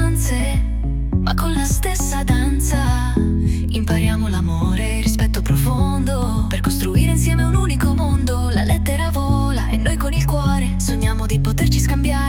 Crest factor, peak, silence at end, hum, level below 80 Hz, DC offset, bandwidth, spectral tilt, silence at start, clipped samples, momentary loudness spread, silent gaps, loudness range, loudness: 12 dB; -4 dBFS; 0 s; none; -20 dBFS; under 0.1%; 17 kHz; -5.5 dB/octave; 0 s; under 0.1%; 3 LU; none; 1 LU; -19 LUFS